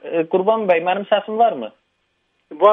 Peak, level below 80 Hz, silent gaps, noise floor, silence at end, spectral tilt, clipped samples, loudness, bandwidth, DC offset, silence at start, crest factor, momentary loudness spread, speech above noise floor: 0 dBFS; -72 dBFS; none; -68 dBFS; 0 s; -8 dB/octave; under 0.1%; -18 LUFS; 3.9 kHz; under 0.1%; 0.05 s; 18 dB; 7 LU; 50 dB